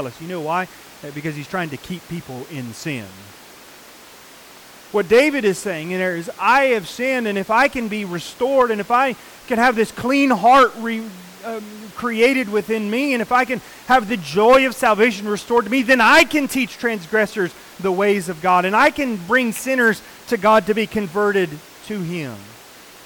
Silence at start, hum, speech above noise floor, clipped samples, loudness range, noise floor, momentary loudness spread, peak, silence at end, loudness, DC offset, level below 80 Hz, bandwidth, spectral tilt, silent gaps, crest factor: 0 s; none; 24 dB; under 0.1%; 12 LU; -43 dBFS; 17 LU; -4 dBFS; 0.5 s; -18 LUFS; under 0.1%; -54 dBFS; 19 kHz; -4.5 dB/octave; none; 14 dB